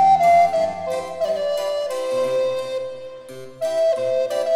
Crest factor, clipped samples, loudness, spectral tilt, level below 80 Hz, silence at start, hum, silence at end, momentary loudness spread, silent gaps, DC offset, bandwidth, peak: 12 dB; under 0.1%; -21 LUFS; -3.5 dB/octave; -60 dBFS; 0 s; none; 0 s; 17 LU; none; under 0.1%; 15 kHz; -8 dBFS